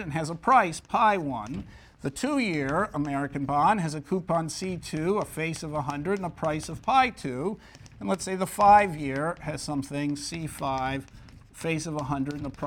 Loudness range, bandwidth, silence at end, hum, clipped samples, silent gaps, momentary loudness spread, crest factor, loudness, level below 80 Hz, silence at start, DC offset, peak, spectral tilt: 5 LU; 17.5 kHz; 0 s; none; under 0.1%; none; 11 LU; 20 dB; -27 LUFS; -52 dBFS; 0 s; under 0.1%; -8 dBFS; -5.5 dB/octave